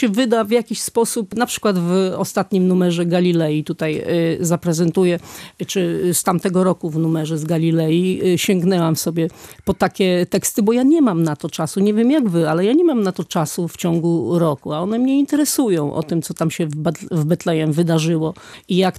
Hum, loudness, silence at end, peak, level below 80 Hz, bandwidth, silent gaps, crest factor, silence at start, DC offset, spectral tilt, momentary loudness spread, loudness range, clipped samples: none; -18 LUFS; 0 s; -4 dBFS; -56 dBFS; 15 kHz; none; 14 dB; 0 s; under 0.1%; -5.5 dB/octave; 6 LU; 2 LU; under 0.1%